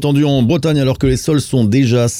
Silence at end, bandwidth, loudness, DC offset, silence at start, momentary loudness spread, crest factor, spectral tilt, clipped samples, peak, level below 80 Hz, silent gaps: 0 s; 15.5 kHz; -14 LUFS; under 0.1%; 0 s; 3 LU; 10 dB; -6.5 dB/octave; under 0.1%; -4 dBFS; -34 dBFS; none